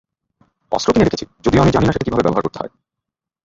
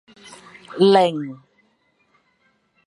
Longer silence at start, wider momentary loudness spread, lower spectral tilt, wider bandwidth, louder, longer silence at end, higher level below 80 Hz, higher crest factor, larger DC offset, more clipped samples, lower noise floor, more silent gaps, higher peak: about the same, 0.7 s vs 0.7 s; second, 12 LU vs 27 LU; about the same, -6.5 dB/octave vs -6 dB/octave; second, 8 kHz vs 11 kHz; about the same, -17 LUFS vs -17 LUFS; second, 0.8 s vs 1.5 s; first, -36 dBFS vs -72 dBFS; second, 16 dB vs 22 dB; neither; neither; first, -83 dBFS vs -65 dBFS; neither; about the same, -2 dBFS vs -2 dBFS